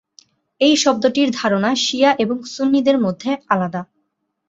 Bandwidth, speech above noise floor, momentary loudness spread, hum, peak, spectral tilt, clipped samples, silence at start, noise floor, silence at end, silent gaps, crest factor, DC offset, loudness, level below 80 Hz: 7.8 kHz; 54 dB; 7 LU; none; -2 dBFS; -4 dB/octave; under 0.1%; 0.6 s; -71 dBFS; 0.65 s; none; 16 dB; under 0.1%; -17 LUFS; -62 dBFS